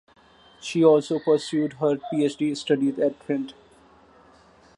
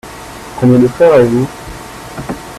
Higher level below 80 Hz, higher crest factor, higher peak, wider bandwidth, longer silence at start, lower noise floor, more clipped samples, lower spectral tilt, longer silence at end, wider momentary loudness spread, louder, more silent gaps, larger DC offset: second, -68 dBFS vs -38 dBFS; first, 20 dB vs 12 dB; second, -6 dBFS vs 0 dBFS; second, 11 kHz vs 14 kHz; first, 0.65 s vs 0.05 s; first, -54 dBFS vs -29 dBFS; neither; second, -6 dB/octave vs -7.5 dB/octave; first, 1.25 s vs 0 s; second, 11 LU vs 20 LU; second, -23 LUFS vs -10 LUFS; neither; neither